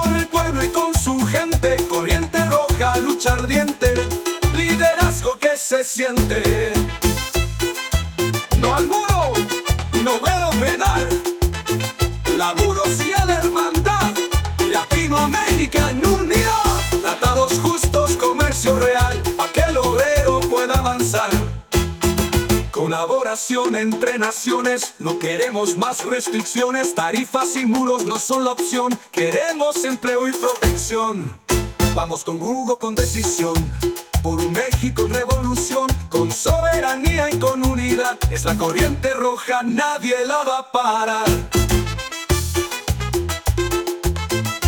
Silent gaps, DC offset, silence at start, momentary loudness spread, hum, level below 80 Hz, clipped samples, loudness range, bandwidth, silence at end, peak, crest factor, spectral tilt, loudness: none; under 0.1%; 0 s; 5 LU; none; -28 dBFS; under 0.1%; 3 LU; 19.5 kHz; 0 s; -2 dBFS; 16 dB; -4.5 dB/octave; -19 LUFS